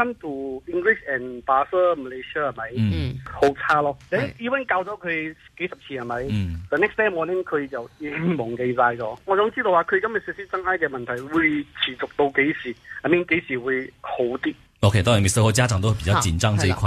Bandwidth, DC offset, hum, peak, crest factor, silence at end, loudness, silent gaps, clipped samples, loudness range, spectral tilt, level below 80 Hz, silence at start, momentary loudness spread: 13 kHz; under 0.1%; none; -4 dBFS; 18 dB; 0 s; -23 LUFS; none; under 0.1%; 4 LU; -5 dB/octave; -44 dBFS; 0 s; 11 LU